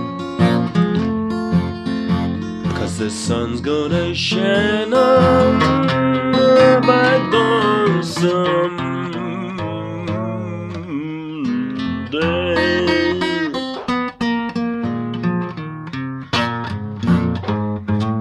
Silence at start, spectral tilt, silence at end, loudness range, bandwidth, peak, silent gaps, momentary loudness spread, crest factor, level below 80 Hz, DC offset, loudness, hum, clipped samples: 0 s; -6 dB/octave; 0 s; 9 LU; 11.5 kHz; 0 dBFS; none; 12 LU; 16 dB; -44 dBFS; under 0.1%; -18 LUFS; none; under 0.1%